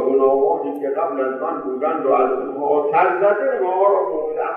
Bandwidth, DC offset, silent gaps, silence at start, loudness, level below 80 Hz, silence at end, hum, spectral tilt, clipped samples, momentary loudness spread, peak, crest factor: 3.6 kHz; under 0.1%; none; 0 s; -19 LUFS; -64 dBFS; 0 s; none; -8.5 dB/octave; under 0.1%; 7 LU; -4 dBFS; 14 dB